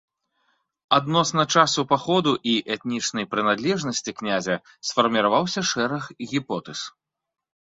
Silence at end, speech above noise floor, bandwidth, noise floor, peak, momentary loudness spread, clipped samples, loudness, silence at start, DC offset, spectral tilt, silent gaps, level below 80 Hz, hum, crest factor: 0.9 s; 62 dB; 8 kHz; -85 dBFS; -2 dBFS; 9 LU; under 0.1%; -23 LUFS; 0.9 s; under 0.1%; -3.5 dB/octave; none; -64 dBFS; none; 22 dB